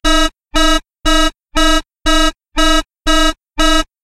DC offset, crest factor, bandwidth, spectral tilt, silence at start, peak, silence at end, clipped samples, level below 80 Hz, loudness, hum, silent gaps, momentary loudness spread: under 0.1%; 10 dB; 14.5 kHz; -2.5 dB/octave; 0.05 s; -2 dBFS; 0.2 s; under 0.1%; -18 dBFS; -14 LUFS; none; none; 3 LU